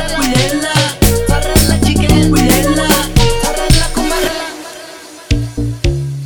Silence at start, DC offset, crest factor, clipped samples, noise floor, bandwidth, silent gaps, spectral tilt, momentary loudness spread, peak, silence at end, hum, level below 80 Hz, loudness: 0 s; under 0.1%; 12 dB; under 0.1%; -32 dBFS; 19.5 kHz; none; -4.5 dB/octave; 12 LU; 0 dBFS; 0 s; none; -18 dBFS; -12 LUFS